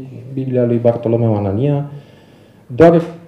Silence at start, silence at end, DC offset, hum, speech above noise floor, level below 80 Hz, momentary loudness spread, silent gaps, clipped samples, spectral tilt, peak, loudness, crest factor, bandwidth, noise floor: 0 s; 0.1 s; under 0.1%; none; 30 dB; -50 dBFS; 16 LU; none; 0.1%; -10 dB/octave; 0 dBFS; -14 LUFS; 16 dB; 7.8 kHz; -45 dBFS